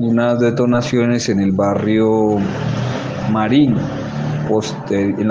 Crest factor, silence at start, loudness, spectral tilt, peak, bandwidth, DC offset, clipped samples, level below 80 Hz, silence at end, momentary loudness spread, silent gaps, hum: 12 dB; 0 s; -17 LUFS; -7 dB/octave; -2 dBFS; 7.8 kHz; under 0.1%; under 0.1%; -46 dBFS; 0 s; 7 LU; none; none